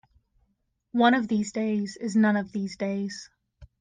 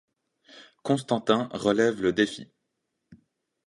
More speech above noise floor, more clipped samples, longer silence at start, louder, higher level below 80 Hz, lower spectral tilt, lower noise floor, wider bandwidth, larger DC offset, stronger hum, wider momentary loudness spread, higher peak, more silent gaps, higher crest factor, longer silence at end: second, 49 dB vs 55 dB; neither; first, 0.95 s vs 0.55 s; about the same, -26 LUFS vs -25 LUFS; about the same, -62 dBFS vs -64 dBFS; about the same, -5.5 dB/octave vs -5.5 dB/octave; second, -74 dBFS vs -80 dBFS; second, 9.6 kHz vs 11.5 kHz; neither; neither; first, 11 LU vs 7 LU; second, -10 dBFS vs -6 dBFS; neither; second, 18 dB vs 24 dB; second, 0.15 s vs 0.5 s